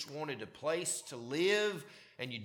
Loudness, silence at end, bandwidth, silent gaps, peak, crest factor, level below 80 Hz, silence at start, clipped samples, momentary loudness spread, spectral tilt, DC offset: -36 LUFS; 0 s; 18.5 kHz; none; -18 dBFS; 18 dB; -82 dBFS; 0 s; under 0.1%; 14 LU; -3 dB/octave; under 0.1%